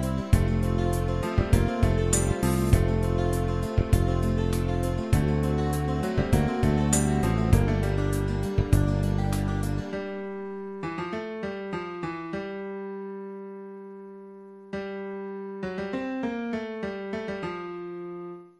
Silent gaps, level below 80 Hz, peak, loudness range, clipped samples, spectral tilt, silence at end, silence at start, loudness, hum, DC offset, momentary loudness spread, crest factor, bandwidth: none; -32 dBFS; -6 dBFS; 11 LU; under 0.1%; -6.5 dB/octave; 0.1 s; 0 s; -27 LUFS; none; under 0.1%; 14 LU; 20 dB; 13.5 kHz